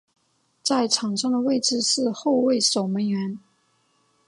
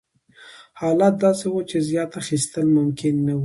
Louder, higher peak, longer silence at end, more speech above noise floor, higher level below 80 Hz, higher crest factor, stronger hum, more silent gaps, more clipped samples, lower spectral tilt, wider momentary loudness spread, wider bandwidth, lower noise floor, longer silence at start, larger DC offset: about the same, -22 LUFS vs -21 LUFS; about the same, -6 dBFS vs -4 dBFS; first, 0.9 s vs 0 s; first, 44 dB vs 29 dB; second, -74 dBFS vs -60 dBFS; about the same, 18 dB vs 16 dB; neither; neither; neither; second, -3.5 dB/octave vs -6 dB/octave; about the same, 8 LU vs 7 LU; about the same, 11.5 kHz vs 11.5 kHz; first, -66 dBFS vs -49 dBFS; first, 0.65 s vs 0.4 s; neither